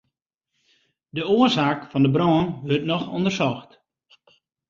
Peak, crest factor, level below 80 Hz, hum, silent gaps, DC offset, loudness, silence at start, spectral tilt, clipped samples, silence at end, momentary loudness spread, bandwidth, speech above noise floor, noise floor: -6 dBFS; 18 dB; -56 dBFS; none; none; under 0.1%; -21 LUFS; 1.15 s; -6.5 dB/octave; under 0.1%; 1.05 s; 9 LU; 7.6 kHz; 58 dB; -79 dBFS